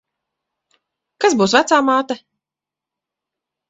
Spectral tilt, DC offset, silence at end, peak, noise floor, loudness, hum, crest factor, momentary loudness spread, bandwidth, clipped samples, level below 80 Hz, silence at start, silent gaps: -3.5 dB/octave; under 0.1%; 1.5 s; 0 dBFS; -87 dBFS; -16 LUFS; none; 20 dB; 12 LU; 8.2 kHz; under 0.1%; -62 dBFS; 1.2 s; none